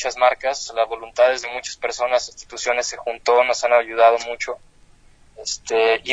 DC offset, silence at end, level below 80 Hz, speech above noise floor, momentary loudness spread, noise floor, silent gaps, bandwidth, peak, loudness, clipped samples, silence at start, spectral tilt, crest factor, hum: under 0.1%; 0 s; -54 dBFS; 31 dB; 12 LU; -50 dBFS; none; 8.6 kHz; -2 dBFS; -20 LUFS; under 0.1%; 0 s; -0.5 dB/octave; 18 dB; none